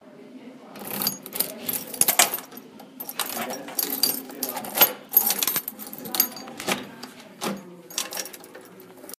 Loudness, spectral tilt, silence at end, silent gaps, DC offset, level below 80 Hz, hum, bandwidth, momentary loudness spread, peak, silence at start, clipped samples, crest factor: -24 LUFS; -1 dB/octave; 0.05 s; none; under 0.1%; -72 dBFS; none; 16 kHz; 23 LU; 0 dBFS; 0.05 s; under 0.1%; 28 dB